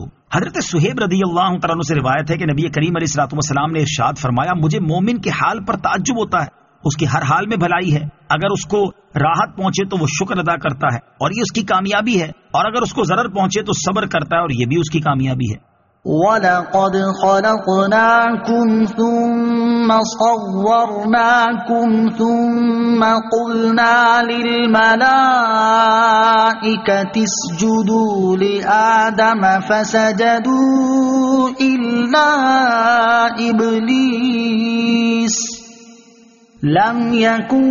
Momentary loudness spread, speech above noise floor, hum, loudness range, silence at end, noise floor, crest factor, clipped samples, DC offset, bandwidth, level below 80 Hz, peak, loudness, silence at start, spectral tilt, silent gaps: 7 LU; 32 dB; none; 5 LU; 0 s; -47 dBFS; 14 dB; under 0.1%; under 0.1%; 7.4 kHz; -50 dBFS; -2 dBFS; -15 LUFS; 0 s; -4.5 dB/octave; none